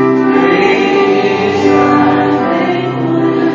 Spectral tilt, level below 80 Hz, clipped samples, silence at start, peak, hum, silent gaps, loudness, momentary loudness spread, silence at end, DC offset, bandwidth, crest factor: -6.5 dB/octave; -46 dBFS; under 0.1%; 0 s; 0 dBFS; none; none; -11 LUFS; 4 LU; 0 s; under 0.1%; 7.4 kHz; 10 dB